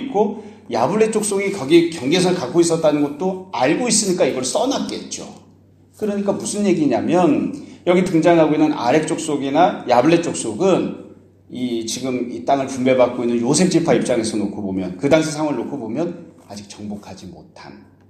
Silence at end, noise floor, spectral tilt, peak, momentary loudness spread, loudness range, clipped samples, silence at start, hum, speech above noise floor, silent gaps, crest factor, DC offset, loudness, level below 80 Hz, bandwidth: 0.3 s; -50 dBFS; -5 dB/octave; 0 dBFS; 15 LU; 4 LU; under 0.1%; 0 s; none; 32 dB; none; 18 dB; under 0.1%; -18 LUFS; -58 dBFS; 14.5 kHz